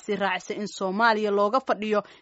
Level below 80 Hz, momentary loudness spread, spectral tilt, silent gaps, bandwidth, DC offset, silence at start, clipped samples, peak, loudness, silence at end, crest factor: -74 dBFS; 8 LU; -3 dB/octave; none; 8 kHz; under 0.1%; 0.1 s; under 0.1%; -8 dBFS; -25 LUFS; 0.2 s; 18 dB